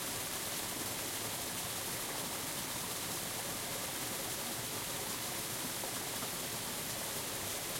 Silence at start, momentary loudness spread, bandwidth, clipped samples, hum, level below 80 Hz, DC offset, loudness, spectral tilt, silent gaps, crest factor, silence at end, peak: 0 s; 1 LU; 16.5 kHz; under 0.1%; none; -64 dBFS; under 0.1%; -37 LUFS; -1.5 dB/octave; none; 14 dB; 0 s; -26 dBFS